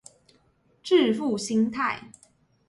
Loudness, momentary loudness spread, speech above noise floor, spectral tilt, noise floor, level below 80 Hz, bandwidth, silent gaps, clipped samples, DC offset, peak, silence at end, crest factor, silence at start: -25 LUFS; 12 LU; 41 dB; -4.5 dB/octave; -64 dBFS; -68 dBFS; 11.5 kHz; none; under 0.1%; under 0.1%; -10 dBFS; 0.6 s; 18 dB; 0.85 s